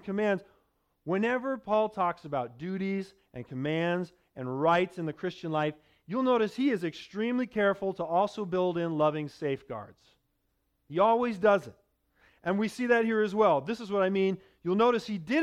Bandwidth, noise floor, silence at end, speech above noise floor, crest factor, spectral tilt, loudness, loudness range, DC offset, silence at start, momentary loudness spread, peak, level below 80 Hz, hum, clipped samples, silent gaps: 12.5 kHz; -76 dBFS; 0 s; 48 dB; 18 dB; -7 dB/octave; -29 LUFS; 4 LU; under 0.1%; 0.05 s; 11 LU; -12 dBFS; -68 dBFS; none; under 0.1%; none